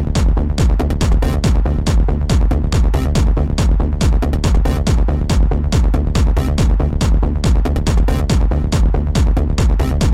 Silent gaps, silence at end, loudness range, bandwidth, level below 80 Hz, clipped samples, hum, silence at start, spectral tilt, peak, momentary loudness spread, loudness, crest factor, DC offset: none; 0 s; 0 LU; 12.5 kHz; -14 dBFS; under 0.1%; none; 0 s; -6.5 dB/octave; -4 dBFS; 1 LU; -16 LUFS; 8 dB; 0.5%